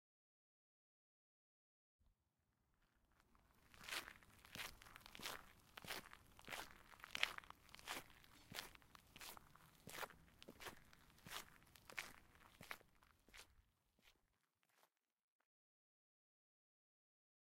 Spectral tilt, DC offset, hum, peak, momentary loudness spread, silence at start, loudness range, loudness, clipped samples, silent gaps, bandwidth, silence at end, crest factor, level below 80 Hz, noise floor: -1 dB/octave; under 0.1%; none; -16 dBFS; 15 LU; 2 s; 9 LU; -53 LUFS; under 0.1%; none; 16.5 kHz; 2.6 s; 42 dB; -76 dBFS; -88 dBFS